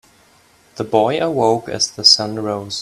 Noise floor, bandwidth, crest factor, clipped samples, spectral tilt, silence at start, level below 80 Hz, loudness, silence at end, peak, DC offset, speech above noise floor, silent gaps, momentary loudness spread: -52 dBFS; 16 kHz; 18 dB; under 0.1%; -3 dB/octave; 0.75 s; -58 dBFS; -15 LUFS; 0 s; 0 dBFS; under 0.1%; 35 dB; none; 12 LU